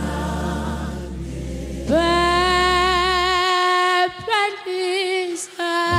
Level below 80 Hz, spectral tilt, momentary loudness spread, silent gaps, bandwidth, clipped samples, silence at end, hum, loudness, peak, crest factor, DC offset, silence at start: -34 dBFS; -4 dB/octave; 13 LU; none; 15 kHz; under 0.1%; 0 s; none; -19 LUFS; -6 dBFS; 14 dB; under 0.1%; 0 s